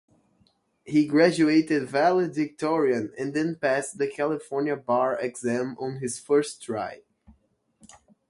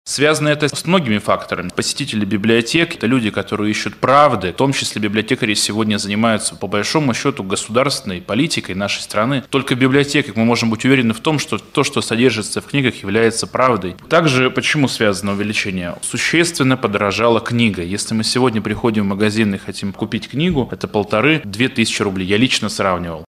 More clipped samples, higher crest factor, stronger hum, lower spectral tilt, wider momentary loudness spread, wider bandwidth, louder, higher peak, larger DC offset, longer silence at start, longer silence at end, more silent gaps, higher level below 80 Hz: neither; about the same, 20 dB vs 16 dB; neither; about the same, -5.5 dB/octave vs -4.5 dB/octave; first, 11 LU vs 6 LU; second, 11.5 kHz vs 15 kHz; second, -25 LUFS vs -16 LUFS; second, -6 dBFS vs 0 dBFS; neither; first, 0.85 s vs 0.05 s; first, 1.35 s vs 0.05 s; neither; second, -68 dBFS vs -48 dBFS